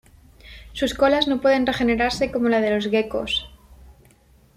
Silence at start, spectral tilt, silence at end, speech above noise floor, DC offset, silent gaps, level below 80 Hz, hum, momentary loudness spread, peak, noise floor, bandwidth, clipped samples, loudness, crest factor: 0.45 s; -4.5 dB/octave; 0.85 s; 34 dB; under 0.1%; none; -44 dBFS; none; 7 LU; -6 dBFS; -55 dBFS; 15 kHz; under 0.1%; -21 LUFS; 16 dB